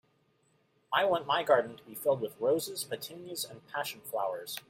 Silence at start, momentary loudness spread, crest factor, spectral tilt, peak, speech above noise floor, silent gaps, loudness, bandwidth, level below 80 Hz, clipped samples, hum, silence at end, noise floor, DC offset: 0.9 s; 11 LU; 20 dB; -3 dB/octave; -12 dBFS; 39 dB; none; -32 LUFS; 16.5 kHz; -78 dBFS; under 0.1%; none; 0.1 s; -71 dBFS; under 0.1%